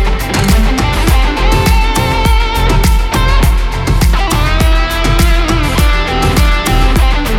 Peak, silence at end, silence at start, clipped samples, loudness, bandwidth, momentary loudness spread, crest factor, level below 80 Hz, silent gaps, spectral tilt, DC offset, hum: 0 dBFS; 0 s; 0 s; under 0.1%; -12 LUFS; 16.5 kHz; 2 LU; 10 dB; -12 dBFS; none; -5 dB/octave; under 0.1%; none